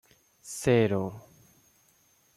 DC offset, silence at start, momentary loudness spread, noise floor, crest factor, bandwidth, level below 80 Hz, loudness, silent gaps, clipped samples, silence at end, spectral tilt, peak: under 0.1%; 0.45 s; 25 LU; -65 dBFS; 18 dB; 14.5 kHz; -62 dBFS; -27 LUFS; none; under 0.1%; 1.15 s; -6 dB/octave; -12 dBFS